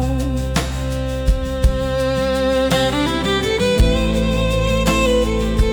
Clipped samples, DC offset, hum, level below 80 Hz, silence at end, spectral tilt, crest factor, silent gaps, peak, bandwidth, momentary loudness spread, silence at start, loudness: under 0.1%; under 0.1%; none; -22 dBFS; 0 s; -5.5 dB/octave; 12 dB; none; -4 dBFS; over 20 kHz; 5 LU; 0 s; -18 LUFS